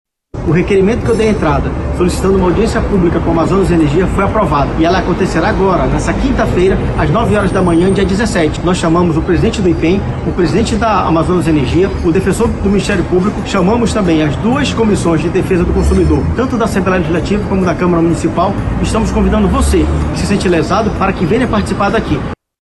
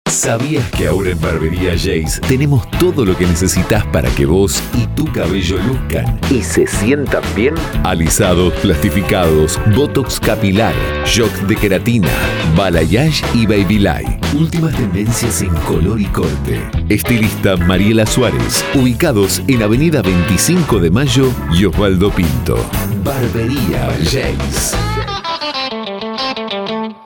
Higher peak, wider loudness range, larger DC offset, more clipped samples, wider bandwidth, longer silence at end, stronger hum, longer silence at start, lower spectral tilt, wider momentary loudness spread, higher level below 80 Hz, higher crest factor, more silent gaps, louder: second, -4 dBFS vs 0 dBFS; about the same, 1 LU vs 3 LU; neither; neither; second, 12 kHz vs over 20 kHz; first, 0.3 s vs 0 s; neither; first, 0.35 s vs 0.05 s; first, -6.5 dB/octave vs -5 dB/octave; about the same, 3 LU vs 5 LU; about the same, -22 dBFS vs -24 dBFS; about the same, 8 dB vs 12 dB; neither; about the same, -12 LUFS vs -14 LUFS